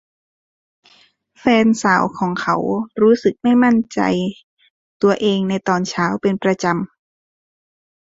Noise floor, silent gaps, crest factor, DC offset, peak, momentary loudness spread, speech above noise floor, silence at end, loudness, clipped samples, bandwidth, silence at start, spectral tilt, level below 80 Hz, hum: -54 dBFS; 4.43-4.57 s, 4.70-5.00 s; 16 dB; under 0.1%; -2 dBFS; 8 LU; 38 dB; 1.25 s; -17 LUFS; under 0.1%; 7.8 kHz; 1.45 s; -6 dB/octave; -58 dBFS; none